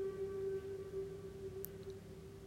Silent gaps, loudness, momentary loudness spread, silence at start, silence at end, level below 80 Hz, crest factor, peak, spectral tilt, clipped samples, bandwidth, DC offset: none; -46 LUFS; 9 LU; 0 s; 0 s; -64 dBFS; 24 dB; -22 dBFS; -6.5 dB/octave; under 0.1%; 16 kHz; under 0.1%